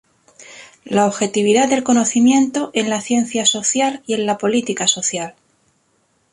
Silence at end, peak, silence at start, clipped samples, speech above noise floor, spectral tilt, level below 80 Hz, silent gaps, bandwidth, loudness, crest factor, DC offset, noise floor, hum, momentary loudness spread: 1 s; -2 dBFS; 0.4 s; under 0.1%; 46 dB; -3 dB/octave; -62 dBFS; none; 11.5 kHz; -17 LUFS; 16 dB; under 0.1%; -62 dBFS; none; 7 LU